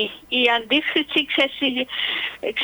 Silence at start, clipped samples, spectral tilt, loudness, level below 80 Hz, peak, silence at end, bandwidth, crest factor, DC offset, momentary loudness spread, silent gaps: 0 s; under 0.1%; -3.5 dB/octave; -20 LUFS; -60 dBFS; -4 dBFS; 0 s; over 20 kHz; 18 dB; under 0.1%; 5 LU; none